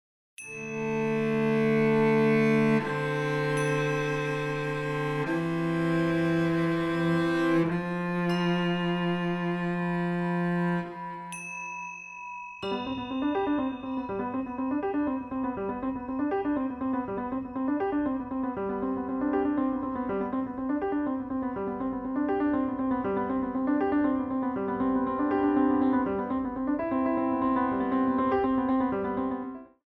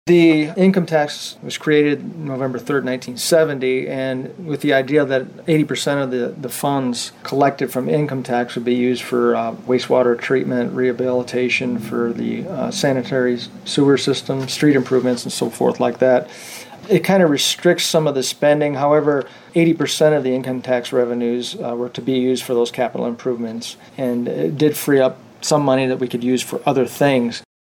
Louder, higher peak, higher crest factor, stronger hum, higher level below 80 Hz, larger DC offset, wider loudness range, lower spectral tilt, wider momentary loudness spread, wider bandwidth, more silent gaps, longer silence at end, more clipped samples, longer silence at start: second, -28 LUFS vs -18 LUFS; second, -14 dBFS vs -4 dBFS; about the same, 14 dB vs 14 dB; neither; first, -56 dBFS vs -64 dBFS; neither; about the same, 5 LU vs 3 LU; first, -7.5 dB/octave vs -5 dB/octave; about the same, 8 LU vs 9 LU; second, 12 kHz vs 17 kHz; neither; about the same, 0.2 s vs 0.2 s; neither; first, 0.4 s vs 0.05 s